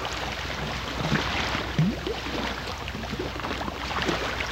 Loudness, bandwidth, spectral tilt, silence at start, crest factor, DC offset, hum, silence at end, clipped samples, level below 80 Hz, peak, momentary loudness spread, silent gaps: -29 LUFS; 16 kHz; -4.5 dB/octave; 0 s; 18 dB; under 0.1%; none; 0 s; under 0.1%; -40 dBFS; -10 dBFS; 6 LU; none